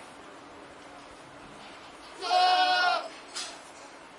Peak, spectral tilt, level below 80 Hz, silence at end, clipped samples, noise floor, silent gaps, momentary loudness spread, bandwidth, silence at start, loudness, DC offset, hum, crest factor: -12 dBFS; -0.5 dB/octave; -70 dBFS; 0 s; under 0.1%; -48 dBFS; none; 24 LU; 11.5 kHz; 0 s; -27 LUFS; under 0.1%; none; 18 dB